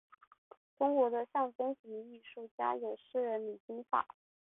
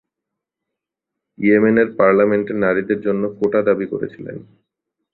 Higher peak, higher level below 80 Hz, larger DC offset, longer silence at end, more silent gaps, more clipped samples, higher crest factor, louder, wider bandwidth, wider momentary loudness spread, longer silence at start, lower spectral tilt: second, -18 dBFS vs -2 dBFS; second, -84 dBFS vs -58 dBFS; neither; second, 0.5 s vs 0.7 s; first, 1.55-1.59 s, 1.79-1.84 s, 2.51-2.58 s, 3.60-3.68 s vs none; neither; about the same, 18 dB vs 16 dB; second, -36 LUFS vs -17 LUFS; about the same, 3.9 kHz vs 4.2 kHz; about the same, 16 LU vs 14 LU; second, 0.8 s vs 1.4 s; second, 1 dB/octave vs -10 dB/octave